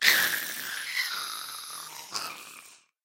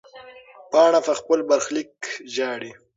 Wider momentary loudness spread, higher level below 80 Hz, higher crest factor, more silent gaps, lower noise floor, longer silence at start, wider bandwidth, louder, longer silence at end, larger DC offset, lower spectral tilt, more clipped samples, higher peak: about the same, 16 LU vs 15 LU; second, -80 dBFS vs -72 dBFS; first, 28 dB vs 18 dB; neither; first, -53 dBFS vs -45 dBFS; second, 0 s vs 0.15 s; first, 16.5 kHz vs 7.8 kHz; second, -30 LUFS vs -21 LUFS; about the same, 0.3 s vs 0.25 s; neither; second, 1.5 dB/octave vs -2.5 dB/octave; neither; about the same, -4 dBFS vs -4 dBFS